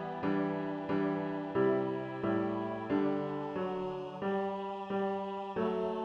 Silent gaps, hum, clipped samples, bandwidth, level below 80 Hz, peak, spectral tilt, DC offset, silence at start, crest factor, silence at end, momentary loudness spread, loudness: none; none; under 0.1%; 6.6 kHz; -70 dBFS; -20 dBFS; -8.5 dB/octave; under 0.1%; 0 s; 14 dB; 0 s; 6 LU; -35 LUFS